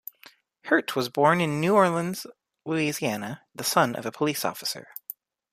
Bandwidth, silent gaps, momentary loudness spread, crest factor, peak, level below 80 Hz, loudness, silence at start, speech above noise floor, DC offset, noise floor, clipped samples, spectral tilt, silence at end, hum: 15.5 kHz; none; 20 LU; 20 dB; -6 dBFS; -70 dBFS; -25 LUFS; 0.65 s; 30 dB; under 0.1%; -55 dBFS; under 0.1%; -4.5 dB/octave; 0.7 s; none